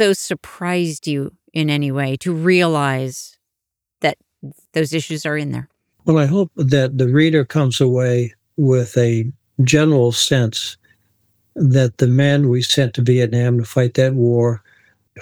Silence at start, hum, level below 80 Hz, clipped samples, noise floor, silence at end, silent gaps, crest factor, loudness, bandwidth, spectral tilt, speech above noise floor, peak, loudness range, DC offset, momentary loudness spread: 0 s; none; -56 dBFS; under 0.1%; -82 dBFS; 0 s; none; 14 dB; -17 LUFS; 15.5 kHz; -6 dB/octave; 66 dB; -2 dBFS; 4 LU; under 0.1%; 11 LU